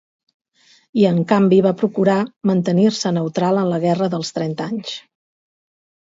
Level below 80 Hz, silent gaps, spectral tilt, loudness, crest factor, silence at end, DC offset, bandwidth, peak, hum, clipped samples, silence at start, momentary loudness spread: -64 dBFS; 2.36-2.41 s; -6.5 dB/octave; -18 LUFS; 18 dB; 1.15 s; under 0.1%; 7.8 kHz; 0 dBFS; none; under 0.1%; 0.95 s; 11 LU